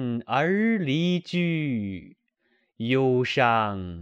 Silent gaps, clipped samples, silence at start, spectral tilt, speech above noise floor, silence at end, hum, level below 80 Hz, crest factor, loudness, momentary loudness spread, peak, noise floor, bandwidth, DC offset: none; under 0.1%; 0 s; -7 dB/octave; 46 dB; 0 s; none; -62 dBFS; 18 dB; -24 LUFS; 9 LU; -6 dBFS; -70 dBFS; 8 kHz; under 0.1%